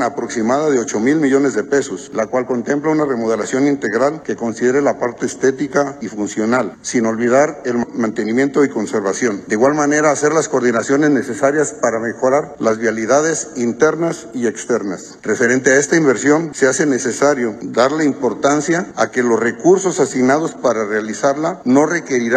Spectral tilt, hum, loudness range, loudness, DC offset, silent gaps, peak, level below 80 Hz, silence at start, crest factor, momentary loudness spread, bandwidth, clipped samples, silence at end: -4.5 dB/octave; none; 2 LU; -16 LUFS; under 0.1%; none; 0 dBFS; -58 dBFS; 0 s; 16 dB; 6 LU; 9.8 kHz; under 0.1%; 0 s